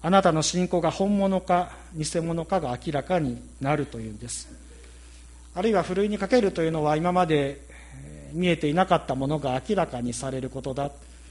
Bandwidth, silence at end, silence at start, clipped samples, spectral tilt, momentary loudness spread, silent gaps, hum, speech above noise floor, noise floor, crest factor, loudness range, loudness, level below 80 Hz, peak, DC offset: 11.5 kHz; 0 s; 0 s; under 0.1%; -5.5 dB/octave; 12 LU; none; none; 21 dB; -46 dBFS; 20 dB; 5 LU; -26 LUFS; -46 dBFS; -6 dBFS; under 0.1%